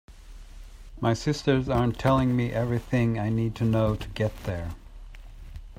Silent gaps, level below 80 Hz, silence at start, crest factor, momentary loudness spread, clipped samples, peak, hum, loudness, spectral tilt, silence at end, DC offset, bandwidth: none; -42 dBFS; 0.1 s; 18 dB; 12 LU; under 0.1%; -8 dBFS; none; -26 LUFS; -7.5 dB/octave; 0.05 s; under 0.1%; 15.5 kHz